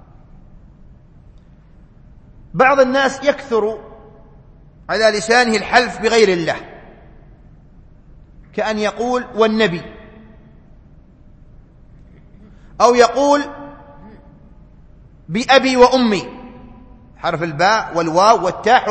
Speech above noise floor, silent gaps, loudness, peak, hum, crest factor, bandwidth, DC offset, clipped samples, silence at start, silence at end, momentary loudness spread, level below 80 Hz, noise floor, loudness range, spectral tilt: 30 dB; none; -15 LUFS; 0 dBFS; none; 18 dB; 8.8 kHz; under 0.1%; under 0.1%; 2.55 s; 0 s; 17 LU; -44 dBFS; -44 dBFS; 5 LU; -4 dB/octave